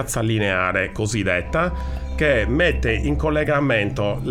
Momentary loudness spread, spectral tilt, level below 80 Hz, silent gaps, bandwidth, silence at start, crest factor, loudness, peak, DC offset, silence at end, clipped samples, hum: 4 LU; -5.5 dB/octave; -30 dBFS; none; 15 kHz; 0 s; 14 dB; -20 LUFS; -6 dBFS; under 0.1%; 0 s; under 0.1%; none